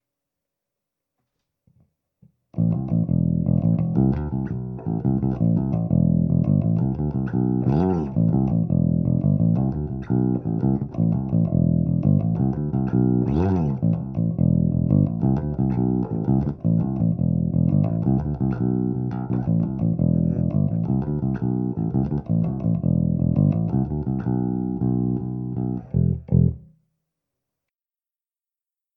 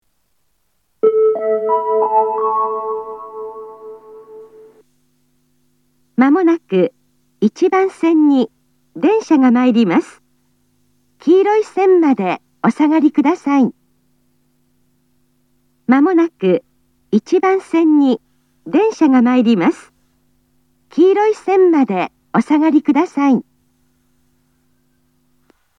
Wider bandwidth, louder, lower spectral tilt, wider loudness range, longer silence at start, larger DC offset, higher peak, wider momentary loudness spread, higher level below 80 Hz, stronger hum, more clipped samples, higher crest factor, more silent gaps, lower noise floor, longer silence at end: second, 2.8 kHz vs 9.8 kHz; second, -22 LUFS vs -14 LUFS; first, -13 dB/octave vs -7 dB/octave; about the same, 3 LU vs 5 LU; first, 2.55 s vs 1.05 s; neither; second, -6 dBFS vs 0 dBFS; second, 5 LU vs 11 LU; first, -38 dBFS vs -70 dBFS; neither; neither; about the same, 16 dB vs 16 dB; neither; first, under -90 dBFS vs -67 dBFS; about the same, 2.35 s vs 2.35 s